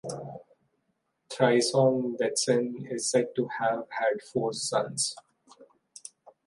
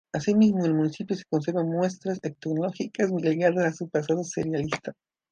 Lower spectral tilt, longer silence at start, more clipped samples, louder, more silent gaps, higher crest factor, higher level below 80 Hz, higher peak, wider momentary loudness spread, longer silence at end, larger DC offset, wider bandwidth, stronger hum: second, -4 dB/octave vs -6.5 dB/octave; about the same, 0.05 s vs 0.15 s; neither; about the same, -27 LUFS vs -26 LUFS; neither; about the same, 20 dB vs 18 dB; second, -76 dBFS vs -64 dBFS; about the same, -10 dBFS vs -8 dBFS; first, 22 LU vs 10 LU; second, 0.15 s vs 0.4 s; neither; first, 11.5 kHz vs 9 kHz; neither